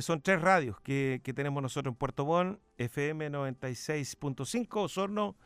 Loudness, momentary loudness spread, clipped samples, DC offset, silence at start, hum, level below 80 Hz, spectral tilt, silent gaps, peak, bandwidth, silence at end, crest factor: -33 LUFS; 10 LU; under 0.1%; under 0.1%; 0 s; none; -62 dBFS; -5.5 dB/octave; none; -12 dBFS; 15.5 kHz; 0.15 s; 20 dB